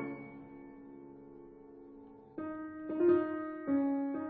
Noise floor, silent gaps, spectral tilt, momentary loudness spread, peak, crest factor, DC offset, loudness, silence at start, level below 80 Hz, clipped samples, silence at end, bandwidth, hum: -54 dBFS; none; -7.5 dB/octave; 25 LU; -18 dBFS; 18 dB; under 0.1%; -34 LUFS; 0 s; -72 dBFS; under 0.1%; 0 s; 3.7 kHz; none